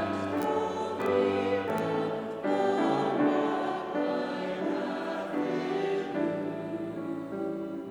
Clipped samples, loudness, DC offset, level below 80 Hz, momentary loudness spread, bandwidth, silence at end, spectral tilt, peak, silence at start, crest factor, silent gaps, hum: under 0.1%; -30 LUFS; under 0.1%; -70 dBFS; 8 LU; over 20 kHz; 0 s; -6.5 dB/octave; -14 dBFS; 0 s; 16 dB; none; none